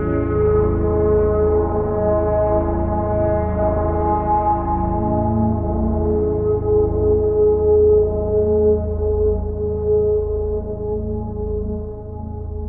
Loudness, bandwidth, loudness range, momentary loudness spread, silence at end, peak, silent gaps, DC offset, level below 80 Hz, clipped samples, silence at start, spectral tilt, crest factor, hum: -19 LUFS; 2.7 kHz; 4 LU; 9 LU; 0 s; -6 dBFS; none; under 0.1%; -26 dBFS; under 0.1%; 0 s; -15 dB/octave; 12 dB; none